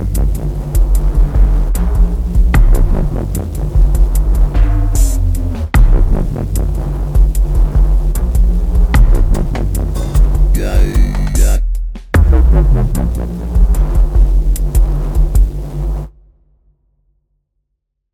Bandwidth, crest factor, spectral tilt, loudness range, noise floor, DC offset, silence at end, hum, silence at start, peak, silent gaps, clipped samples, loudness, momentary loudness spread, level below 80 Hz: 15 kHz; 10 dB; -7 dB/octave; 2 LU; -71 dBFS; under 0.1%; 2.05 s; none; 0 s; -2 dBFS; none; under 0.1%; -15 LUFS; 6 LU; -12 dBFS